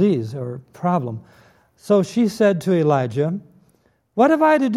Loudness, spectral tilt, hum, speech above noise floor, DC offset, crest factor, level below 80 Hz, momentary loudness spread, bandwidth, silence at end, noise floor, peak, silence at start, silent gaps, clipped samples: -19 LUFS; -7.5 dB/octave; none; 42 dB; under 0.1%; 16 dB; -66 dBFS; 15 LU; 13.5 kHz; 0 s; -61 dBFS; -4 dBFS; 0 s; none; under 0.1%